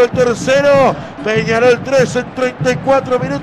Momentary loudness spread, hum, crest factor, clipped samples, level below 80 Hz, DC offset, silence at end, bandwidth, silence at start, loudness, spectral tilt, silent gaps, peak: 7 LU; none; 10 dB; under 0.1%; -42 dBFS; under 0.1%; 0 s; 12.5 kHz; 0 s; -13 LUFS; -5.5 dB/octave; none; -2 dBFS